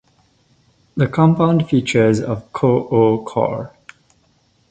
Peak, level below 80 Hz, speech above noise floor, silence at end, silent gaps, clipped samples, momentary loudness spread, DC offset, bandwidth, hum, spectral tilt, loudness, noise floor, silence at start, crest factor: -2 dBFS; -50 dBFS; 43 dB; 1 s; none; under 0.1%; 10 LU; under 0.1%; 9 kHz; none; -7.5 dB/octave; -17 LUFS; -59 dBFS; 0.95 s; 16 dB